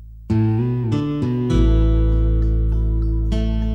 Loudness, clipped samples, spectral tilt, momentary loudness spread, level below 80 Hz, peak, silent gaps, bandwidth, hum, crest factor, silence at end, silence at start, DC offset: -20 LUFS; under 0.1%; -9 dB/octave; 4 LU; -20 dBFS; -6 dBFS; none; 6.2 kHz; none; 12 dB; 0 s; 0 s; 0.1%